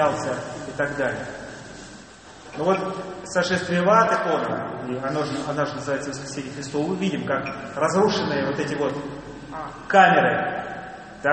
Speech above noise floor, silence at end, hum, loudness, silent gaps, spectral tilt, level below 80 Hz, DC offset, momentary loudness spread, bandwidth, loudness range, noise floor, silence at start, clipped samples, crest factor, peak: 21 dB; 0 s; none; -23 LUFS; none; -5 dB/octave; -56 dBFS; under 0.1%; 19 LU; 8.8 kHz; 5 LU; -44 dBFS; 0 s; under 0.1%; 22 dB; -2 dBFS